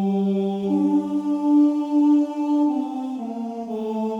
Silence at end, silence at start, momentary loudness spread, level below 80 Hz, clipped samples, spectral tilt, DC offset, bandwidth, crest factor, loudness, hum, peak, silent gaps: 0 s; 0 s; 11 LU; -76 dBFS; under 0.1%; -9 dB/octave; under 0.1%; 7 kHz; 12 dB; -22 LUFS; none; -10 dBFS; none